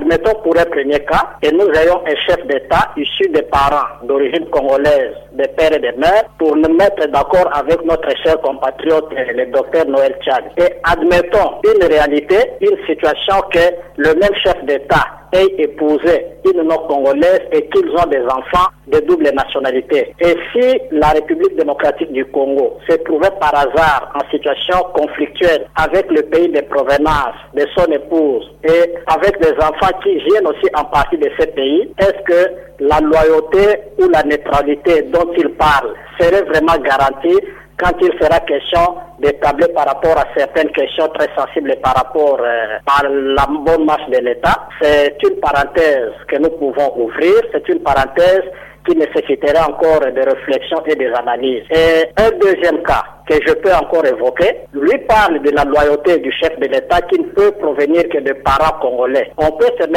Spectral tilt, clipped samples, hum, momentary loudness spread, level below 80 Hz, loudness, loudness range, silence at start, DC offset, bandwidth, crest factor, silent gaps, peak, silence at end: -5.5 dB/octave; under 0.1%; none; 5 LU; -34 dBFS; -13 LUFS; 2 LU; 0 s; under 0.1%; 16.5 kHz; 8 dB; none; -4 dBFS; 0 s